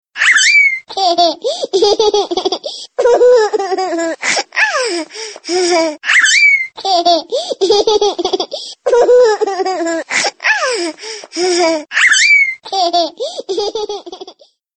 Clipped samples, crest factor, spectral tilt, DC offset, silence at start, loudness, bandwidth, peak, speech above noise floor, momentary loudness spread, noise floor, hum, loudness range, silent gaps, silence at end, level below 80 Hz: under 0.1%; 14 dB; 0 dB/octave; under 0.1%; 0.15 s; -12 LUFS; 8.8 kHz; 0 dBFS; 28 dB; 13 LU; -41 dBFS; none; 2 LU; none; 0.45 s; -56 dBFS